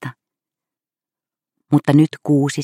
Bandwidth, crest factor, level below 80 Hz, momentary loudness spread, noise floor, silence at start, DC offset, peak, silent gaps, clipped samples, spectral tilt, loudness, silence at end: 13 kHz; 18 dB; -64 dBFS; 7 LU; under -90 dBFS; 0 s; under 0.1%; -2 dBFS; none; under 0.1%; -7 dB/octave; -16 LUFS; 0 s